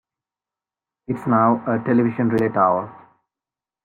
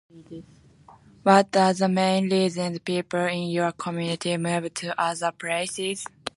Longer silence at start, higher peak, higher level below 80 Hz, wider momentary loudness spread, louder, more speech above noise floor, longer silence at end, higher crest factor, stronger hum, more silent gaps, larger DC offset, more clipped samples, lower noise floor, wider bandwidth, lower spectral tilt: first, 1.1 s vs 0.15 s; about the same, -4 dBFS vs -2 dBFS; about the same, -62 dBFS vs -66 dBFS; about the same, 10 LU vs 11 LU; first, -19 LUFS vs -24 LUFS; first, 71 dB vs 28 dB; first, 0.9 s vs 0.05 s; second, 16 dB vs 22 dB; neither; neither; neither; neither; first, -89 dBFS vs -52 dBFS; second, 5.4 kHz vs 11.5 kHz; first, -10 dB/octave vs -5 dB/octave